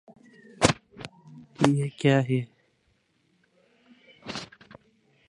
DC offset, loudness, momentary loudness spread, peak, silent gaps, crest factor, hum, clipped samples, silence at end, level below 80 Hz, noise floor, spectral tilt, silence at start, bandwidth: under 0.1%; -26 LUFS; 21 LU; -2 dBFS; none; 28 dB; none; under 0.1%; 0.85 s; -56 dBFS; -69 dBFS; -5.5 dB/octave; 0.6 s; 11.5 kHz